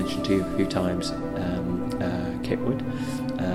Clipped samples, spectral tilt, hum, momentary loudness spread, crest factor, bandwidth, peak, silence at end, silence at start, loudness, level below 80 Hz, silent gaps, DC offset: under 0.1%; -6.5 dB/octave; none; 5 LU; 16 dB; 15.5 kHz; -10 dBFS; 0 s; 0 s; -27 LUFS; -44 dBFS; none; under 0.1%